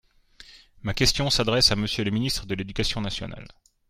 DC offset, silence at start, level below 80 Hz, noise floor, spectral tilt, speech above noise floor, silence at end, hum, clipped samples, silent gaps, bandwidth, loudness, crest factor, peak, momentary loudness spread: under 0.1%; 0.4 s; -40 dBFS; -52 dBFS; -3.5 dB/octave; 27 dB; 0.4 s; none; under 0.1%; none; 16 kHz; -24 LUFS; 22 dB; -4 dBFS; 14 LU